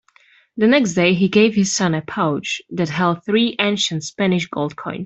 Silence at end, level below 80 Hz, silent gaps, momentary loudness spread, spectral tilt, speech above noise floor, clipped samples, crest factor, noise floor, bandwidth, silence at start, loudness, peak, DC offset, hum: 0 s; -58 dBFS; none; 9 LU; -4.5 dB/octave; 36 dB; under 0.1%; 16 dB; -54 dBFS; 8.2 kHz; 0.55 s; -18 LUFS; -2 dBFS; under 0.1%; none